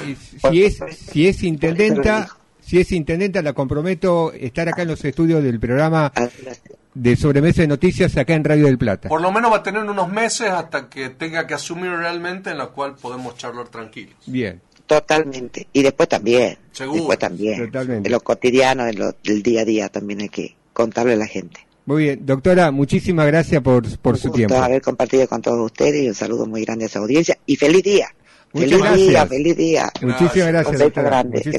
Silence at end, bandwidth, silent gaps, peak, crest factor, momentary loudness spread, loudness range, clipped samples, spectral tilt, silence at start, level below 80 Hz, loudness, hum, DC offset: 0 s; 11.5 kHz; none; -4 dBFS; 14 dB; 13 LU; 7 LU; under 0.1%; -6 dB/octave; 0 s; -40 dBFS; -17 LUFS; none; under 0.1%